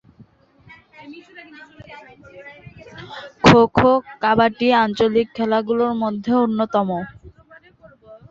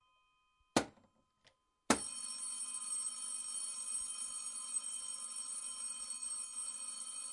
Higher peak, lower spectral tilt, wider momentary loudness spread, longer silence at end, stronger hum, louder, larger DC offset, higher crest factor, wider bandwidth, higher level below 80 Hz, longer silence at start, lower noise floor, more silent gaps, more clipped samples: first, 0 dBFS vs -14 dBFS; first, -6.5 dB/octave vs -1.5 dB/octave; first, 27 LU vs 5 LU; first, 0.15 s vs 0 s; neither; first, -17 LUFS vs -39 LUFS; neither; second, 20 dB vs 28 dB; second, 7.8 kHz vs 11.5 kHz; first, -48 dBFS vs -72 dBFS; first, 1 s vs 0.75 s; second, -51 dBFS vs -76 dBFS; neither; neither